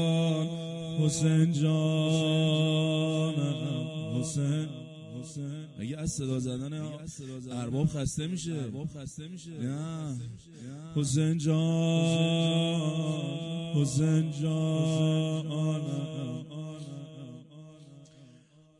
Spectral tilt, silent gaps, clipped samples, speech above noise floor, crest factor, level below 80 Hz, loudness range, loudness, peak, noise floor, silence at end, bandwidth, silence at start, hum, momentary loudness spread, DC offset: -6 dB/octave; none; under 0.1%; 29 dB; 16 dB; -60 dBFS; 8 LU; -30 LUFS; -14 dBFS; -58 dBFS; 0.55 s; 11.5 kHz; 0 s; none; 16 LU; under 0.1%